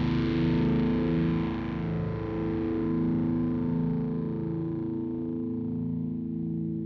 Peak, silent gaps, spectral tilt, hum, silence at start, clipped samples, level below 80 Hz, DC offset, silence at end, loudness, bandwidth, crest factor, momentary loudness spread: -16 dBFS; none; -10 dB/octave; none; 0 s; under 0.1%; -44 dBFS; under 0.1%; 0 s; -29 LUFS; 5.8 kHz; 12 dB; 6 LU